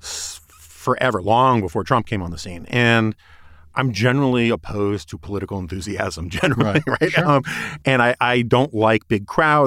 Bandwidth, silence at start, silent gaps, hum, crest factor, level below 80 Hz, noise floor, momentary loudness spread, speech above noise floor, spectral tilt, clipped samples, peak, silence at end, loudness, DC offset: 15.5 kHz; 0.05 s; none; none; 16 dB; -44 dBFS; -44 dBFS; 12 LU; 25 dB; -5.5 dB/octave; under 0.1%; -2 dBFS; 0 s; -19 LUFS; under 0.1%